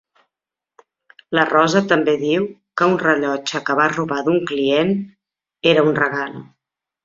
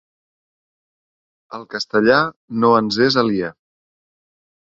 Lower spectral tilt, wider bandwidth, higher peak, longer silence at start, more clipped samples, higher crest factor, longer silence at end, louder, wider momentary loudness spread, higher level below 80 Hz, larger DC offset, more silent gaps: about the same, -5 dB/octave vs -5.5 dB/octave; about the same, 7.6 kHz vs 7.8 kHz; about the same, -2 dBFS vs -2 dBFS; second, 1.3 s vs 1.5 s; neither; about the same, 18 dB vs 18 dB; second, 0.6 s vs 1.25 s; about the same, -18 LUFS vs -17 LUFS; second, 9 LU vs 15 LU; about the same, -62 dBFS vs -58 dBFS; neither; second, none vs 2.36-2.48 s